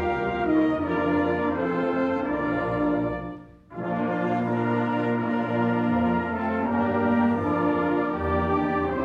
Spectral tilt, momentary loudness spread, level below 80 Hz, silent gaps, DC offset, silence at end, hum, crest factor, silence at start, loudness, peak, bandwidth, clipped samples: -9 dB/octave; 4 LU; -48 dBFS; none; under 0.1%; 0 s; none; 14 dB; 0 s; -25 LUFS; -12 dBFS; 6.4 kHz; under 0.1%